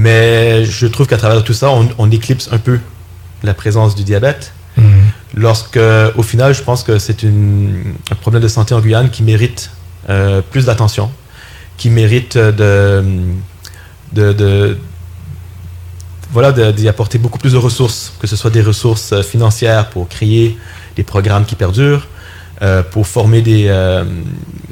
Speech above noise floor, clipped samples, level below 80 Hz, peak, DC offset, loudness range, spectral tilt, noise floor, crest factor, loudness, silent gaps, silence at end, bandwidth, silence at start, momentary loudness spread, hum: 23 dB; under 0.1%; -38 dBFS; 0 dBFS; under 0.1%; 3 LU; -6.5 dB/octave; -33 dBFS; 10 dB; -11 LUFS; none; 0 s; 15.5 kHz; 0 s; 15 LU; none